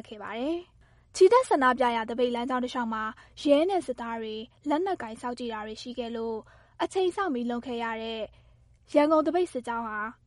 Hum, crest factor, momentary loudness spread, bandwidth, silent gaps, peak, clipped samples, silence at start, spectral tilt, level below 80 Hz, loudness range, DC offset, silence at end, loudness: none; 18 dB; 14 LU; 11.5 kHz; none; -10 dBFS; under 0.1%; 0.1 s; -4 dB/octave; -62 dBFS; 7 LU; under 0.1%; 0.15 s; -28 LUFS